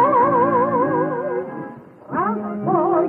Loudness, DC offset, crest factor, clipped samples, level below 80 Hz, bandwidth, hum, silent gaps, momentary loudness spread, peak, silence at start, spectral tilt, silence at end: -19 LUFS; under 0.1%; 14 dB; under 0.1%; -66 dBFS; 3.8 kHz; none; none; 14 LU; -6 dBFS; 0 s; -10.5 dB/octave; 0 s